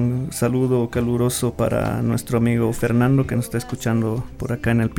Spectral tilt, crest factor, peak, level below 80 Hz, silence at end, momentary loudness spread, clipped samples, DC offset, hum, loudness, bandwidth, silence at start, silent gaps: -6.5 dB/octave; 14 dB; -6 dBFS; -40 dBFS; 0 s; 6 LU; under 0.1%; under 0.1%; none; -21 LUFS; 17.5 kHz; 0 s; none